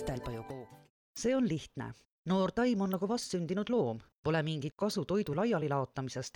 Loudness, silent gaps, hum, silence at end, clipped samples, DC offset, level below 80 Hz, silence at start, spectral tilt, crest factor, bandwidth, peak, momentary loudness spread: -34 LUFS; 0.90-1.14 s, 2.05-2.25 s, 4.17-4.23 s; none; 0.05 s; under 0.1%; under 0.1%; -58 dBFS; 0 s; -6 dB/octave; 14 dB; 19 kHz; -20 dBFS; 13 LU